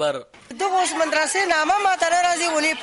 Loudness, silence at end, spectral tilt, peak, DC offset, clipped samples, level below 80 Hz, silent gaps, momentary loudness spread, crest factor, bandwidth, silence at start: -20 LUFS; 0 s; -1 dB/octave; -8 dBFS; under 0.1%; under 0.1%; -60 dBFS; none; 8 LU; 12 dB; 11.5 kHz; 0 s